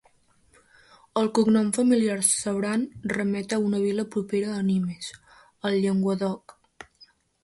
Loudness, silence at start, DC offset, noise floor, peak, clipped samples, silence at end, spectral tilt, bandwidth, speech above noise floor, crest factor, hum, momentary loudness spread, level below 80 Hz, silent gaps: -25 LUFS; 1.15 s; under 0.1%; -62 dBFS; -6 dBFS; under 0.1%; 1.05 s; -5 dB/octave; 11.5 kHz; 38 dB; 20 dB; none; 10 LU; -64 dBFS; none